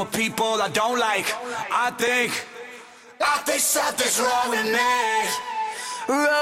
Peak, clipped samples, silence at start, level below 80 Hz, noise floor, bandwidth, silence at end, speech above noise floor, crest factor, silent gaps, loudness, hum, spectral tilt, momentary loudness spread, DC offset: -8 dBFS; under 0.1%; 0 s; -64 dBFS; -44 dBFS; 16.5 kHz; 0 s; 22 dB; 14 dB; none; -22 LUFS; none; -1.5 dB/octave; 9 LU; under 0.1%